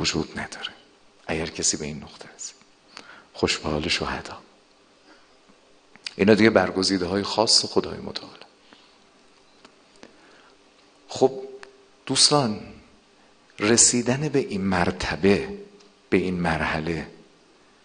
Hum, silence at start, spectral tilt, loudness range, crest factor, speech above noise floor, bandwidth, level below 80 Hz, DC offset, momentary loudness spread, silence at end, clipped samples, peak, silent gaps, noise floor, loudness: none; 0 s; -3 dB/octave; 10 LU; 26 dB; 34 dB; 10 kHz; -52 dBFS; under 0.1%; 23 LU; 0.75 s; under 0.1%; 0 dBFS; none; -57 dBFS; -22 LUFS